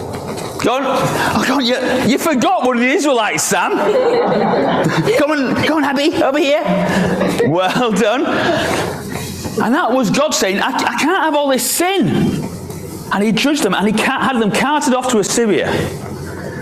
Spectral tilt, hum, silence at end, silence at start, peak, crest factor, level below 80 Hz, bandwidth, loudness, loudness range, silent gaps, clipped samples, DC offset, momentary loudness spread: -4 dB/octave; none; 0 s; 0 s; -2 dBFS; 12 dB; -44 dBFS; 16 kHz; -15 LUFS; 2 LU; none; under 0.1%; under 0.1%; 8 LU